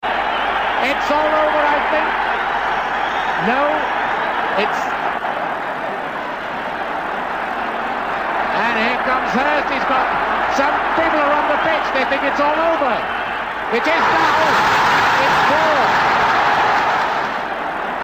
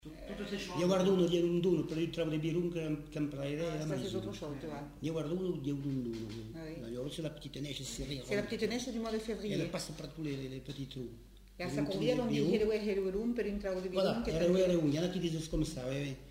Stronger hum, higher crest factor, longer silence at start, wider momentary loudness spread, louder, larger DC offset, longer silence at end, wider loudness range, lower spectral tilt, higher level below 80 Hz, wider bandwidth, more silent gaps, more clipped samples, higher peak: neither; about the same, 12 dB vs 16 dB; about the same, 0 s vs 0.05 s; second, 8 LU vs 13 LU; first, -17 LUFS vs -36 LUFS; neither; about the same, 0 s vs 0 s; about the same, 7 LU vs 7 LU; second, -4 dB/octave vs -6 dB/octave; first, -46 dBFS vs -54 dBFS; about the same, 16 kHz vs 16 kHz; neither; neither; first, -6 dBFS vs -18 dBFS